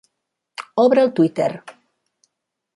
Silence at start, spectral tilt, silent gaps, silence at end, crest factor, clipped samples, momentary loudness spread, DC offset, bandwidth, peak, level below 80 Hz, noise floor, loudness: 0.6 s; -7 dB/octave; none; 1.05 s; 18 dB; under 0.1%; 21 LU; under 0.1%; 11.5 kHz; -4 dBFS; -70 dBFS; -78 dBFS; -18 LUFS